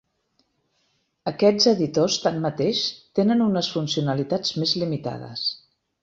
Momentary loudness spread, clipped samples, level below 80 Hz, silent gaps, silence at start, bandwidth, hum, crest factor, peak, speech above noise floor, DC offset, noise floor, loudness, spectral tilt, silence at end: 10 LU; under 0.1%; -64 dBFS; none; 1.25 s; 7.8 kHz; none; 18 dB; -6 dBFS; 48 dB; under 0.1%; -70 dBFS; -23 LUFS; -5 dB/octave; 0.45 s